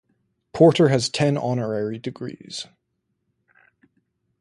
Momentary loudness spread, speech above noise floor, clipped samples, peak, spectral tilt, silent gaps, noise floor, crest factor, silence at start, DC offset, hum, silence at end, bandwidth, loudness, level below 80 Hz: 19 LU; 55 dB; under 0.1%; -2 dBFS; -6 dB/octave; none; -75 dBFS; 22 dB; 0.55 s; under 0.1%; none; 1.75 s; 11.5 kHz; -20 LUFS; -62 dBFS